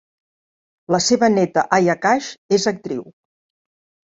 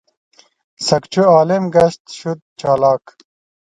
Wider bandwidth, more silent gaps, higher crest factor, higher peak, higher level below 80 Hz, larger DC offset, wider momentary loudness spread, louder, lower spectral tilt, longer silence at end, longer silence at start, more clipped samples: second, 8 kHz vs 9.6 kHz; second, 2.38-2.49 s vs 2.00-2.05 s, 2.42-2.56 s; about the same, 20 dB vs 16 dB; about the same, 0 dBFS vs 0 dBFS; second, -62 dBFS vs -54 dBFS; neither; second, 11 LU vs 14 LU; second, -18 LUFS vs -15 LUFS; second, -4 dB/octave vs -5.5 dB/octave; first, 1.05 s vs 0.75 s; about the same, 0.9 s vs 0.8 s; neither